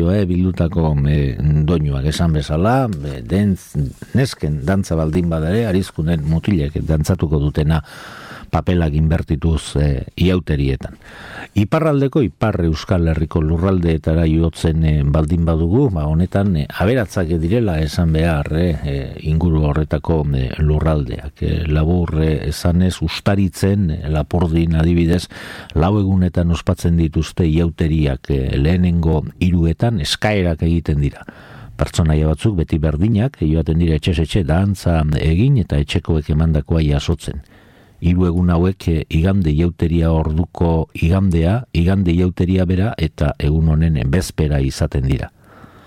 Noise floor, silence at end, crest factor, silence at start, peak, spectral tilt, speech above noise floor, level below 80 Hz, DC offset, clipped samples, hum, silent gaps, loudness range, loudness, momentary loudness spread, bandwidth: -46 dBFS; 0.6 s; 12 dB; 0 s; -4 dBFS; -7.5 dB/octave; 30 dB; -26 dBFS; under 0.1%; under 0.1%; none; none; 2 LU; -17 LUFS; 5 LU; 14 kHz